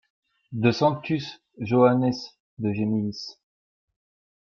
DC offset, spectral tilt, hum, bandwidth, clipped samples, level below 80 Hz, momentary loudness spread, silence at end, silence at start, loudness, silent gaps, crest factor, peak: under 0.1%; -7.5 dB/octave; none; 7 kHz; under 0.1%; -64 dBFS; 18 LU; 1.15 s; 0.5 s; -24 LUFS; 2.40-2.57 s; 20 dB; -6 dBFS